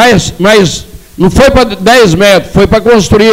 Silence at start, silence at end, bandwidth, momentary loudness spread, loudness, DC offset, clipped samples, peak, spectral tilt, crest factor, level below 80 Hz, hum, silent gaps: 0 s; 0 s; 16.5 kHz; 5 LU; -6 LUFS; under 0.1%; 2%; 0 dBFS; -5 dB/octave; 6 dB; -22 dBFS; none; none